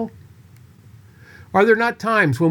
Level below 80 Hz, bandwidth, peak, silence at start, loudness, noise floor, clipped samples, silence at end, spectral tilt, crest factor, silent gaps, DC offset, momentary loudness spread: -60 dBFS; 18 kHz; -4 dBFS; 0 s; -17 LUFS; -47 dBFS; under 0.1%; 0 s; -7 dB/octave; 18 dB; none; under 0.1%; 7 LU